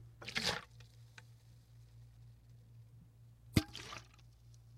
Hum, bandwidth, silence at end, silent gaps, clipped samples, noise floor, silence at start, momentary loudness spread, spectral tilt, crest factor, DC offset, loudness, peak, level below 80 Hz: none; 16 kHz; 0 s; none; under 0.1%; -61 dBFS; 0 s; 25 LU; -4 dB/octave; 32 dB; under 0.1%; -40 LUFS; -12 dBFS; -60 dBFS